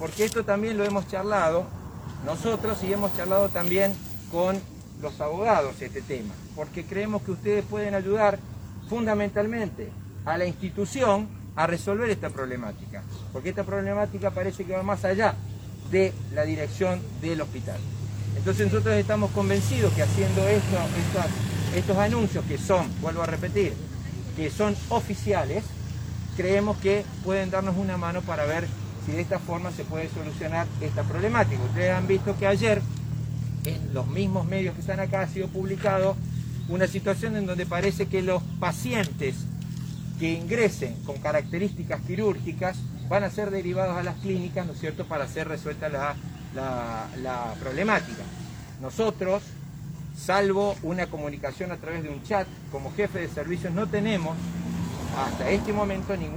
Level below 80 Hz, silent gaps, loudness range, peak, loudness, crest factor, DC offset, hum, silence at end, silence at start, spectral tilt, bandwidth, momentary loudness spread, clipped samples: -46 dBFS; none; 5 LU; -8 dBFS; -27 LUFS; 20 dB; under 0.1%; none; 0 s; 0 s; -6.5 dB/octave; over 20 kHz; 11 LU; under 0.1%